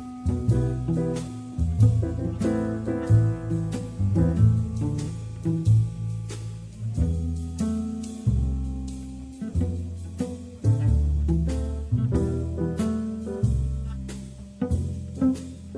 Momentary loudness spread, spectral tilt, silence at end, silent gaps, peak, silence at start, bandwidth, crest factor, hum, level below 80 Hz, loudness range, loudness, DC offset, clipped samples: 12 LU; -8.5 dB/octave; 0 s; none; -8 dBFS; 0 s; 10.5 kHz; 18 dB; none; -32 dBFS; 5 LU; -26 LUFS; under 0.1%; under 0.1%